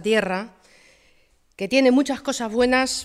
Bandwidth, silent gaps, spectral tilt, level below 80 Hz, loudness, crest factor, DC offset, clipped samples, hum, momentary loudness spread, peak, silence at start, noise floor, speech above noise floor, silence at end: 14 kHz; none; -3.5 dB/octave; -54 dBFS; -21 LUFS; 16 dB; under 0.1%; under 0.1%; none; 13 LU; -6 dBFS; 0 s; -59 dBFS; 39 dB; 0 s